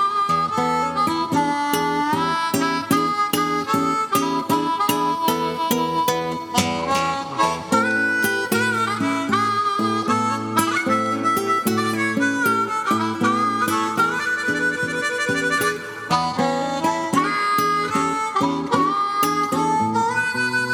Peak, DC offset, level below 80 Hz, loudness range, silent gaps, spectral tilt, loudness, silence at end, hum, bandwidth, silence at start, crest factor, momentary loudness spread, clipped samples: -2 dBFS; under 0.1%; -58 dBFS; 1 LU; none; -4 dB/octave; -20 LUFS; 0 s; none; over 20 kHz; 0 s; 18 dB; 2 LU; under 0.1%